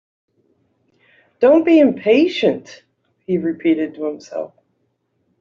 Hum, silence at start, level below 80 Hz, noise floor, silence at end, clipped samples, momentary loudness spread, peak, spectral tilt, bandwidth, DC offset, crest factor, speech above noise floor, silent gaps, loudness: none; 1.4 s; -64 dBFS; -68 dBFS; 0.95 s; under 0.1%; 17 LU; -2 dBFS; -6.5 dB/octave; 7.2 kHz; under 0.1%; 16 dB; 52 dB; none; -17 LUFS